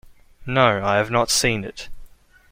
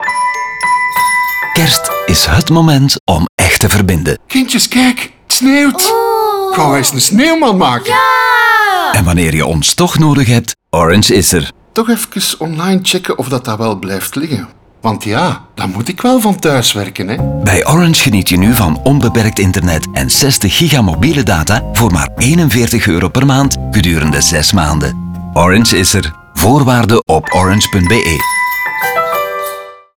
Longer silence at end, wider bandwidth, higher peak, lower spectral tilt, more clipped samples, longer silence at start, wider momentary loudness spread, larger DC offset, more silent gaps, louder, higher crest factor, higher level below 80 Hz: first, 0.45 s vs 0.25 s; second, 16.5 kHz vs over 20 kHz; about the same, -2 dBFS vs 0 dBFS; about the same, -3.5 dB/octave vs -4 dB/octave; neither; about the same, 0.05 s vs 0 s; first, 20 LU vs 8 LU; second, under 0.1% vs 0.4%; second, none vs 3.00-3.07 s, 3.29-3.38 s; second, -19 LUFS vs -10 LUFS; first, 20 dB vs 10 dB; second, -42 dBFS vs -30 dBFS